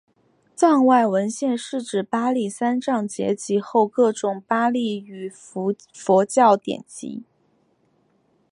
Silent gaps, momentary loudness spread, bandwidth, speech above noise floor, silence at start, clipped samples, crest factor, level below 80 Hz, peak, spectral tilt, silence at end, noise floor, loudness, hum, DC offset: none; 15 LU; 11 kHz; 43 dB; 0.6 s; under 0.1%; 18 dB; -74 dBFS; -2 dBFS; -5 dB/octave; 1.3 s; -64 dBFS; -21 LUFS; none; under 0.1%